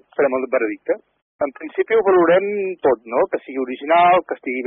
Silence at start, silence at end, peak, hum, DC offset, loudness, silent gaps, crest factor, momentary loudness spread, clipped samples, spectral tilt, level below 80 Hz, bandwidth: 0.2 s; 0 s; -6 dBFS; none; under 0.1%; -19 LUFS; 1.22-1.39 s; 12 dB; 12 LU; under 0.1%; -3.5 dB/octave; -64 dBFS; 3.9 kHz